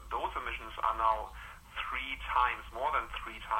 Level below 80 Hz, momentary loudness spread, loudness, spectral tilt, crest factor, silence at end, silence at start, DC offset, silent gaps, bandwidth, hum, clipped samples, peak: -50 dBFS; 11 LU; -34 LUFS; -3.5 dB/octave; 20 dB; 0 s; 0 s; under 0.1%; none; 16 kHz; none; under 0.1%; -16 dBFS